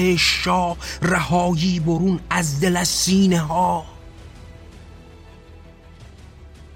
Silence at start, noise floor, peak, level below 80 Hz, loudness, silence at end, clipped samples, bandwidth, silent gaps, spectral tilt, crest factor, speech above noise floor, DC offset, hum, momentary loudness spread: 0 s; -43 dBFS; -4 dBFS; -40 dBFS; -19 LUFS; 0 s; under 0.1%; 16.5 kHz; none; -4.5 dB/octave; 18 dB; 24 dB; under 0.1%; none; 6 LU